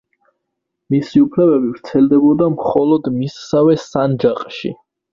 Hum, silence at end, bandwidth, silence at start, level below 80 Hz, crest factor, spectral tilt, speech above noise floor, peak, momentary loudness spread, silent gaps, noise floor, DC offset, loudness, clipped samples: none; 0.4 s; 7.4 kHz; 0.9 s; -54 dBFS; 16 dB; -8 dB/octave; 62 dB; 0 dBFS; 10 LU; none; -76 dBFS; under 0.1%; -15 LUFS; under 0.1%